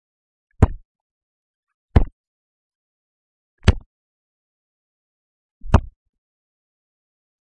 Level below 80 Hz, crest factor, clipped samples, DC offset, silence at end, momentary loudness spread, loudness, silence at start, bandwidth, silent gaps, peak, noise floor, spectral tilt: -30 dBFS; 24 dB; under 0.1%; under 0.1%; 1.65 s; 4 LU; -21 LUFS; 0.6 s; 10 kHz; 0.85-0.95 s, 1.01-1.67 s, 1.74-1.89 s, 2.12-3.58 s, 3.86-5.61 s; 0 dBFS; under -90 dBFS; -7.5 dB/octave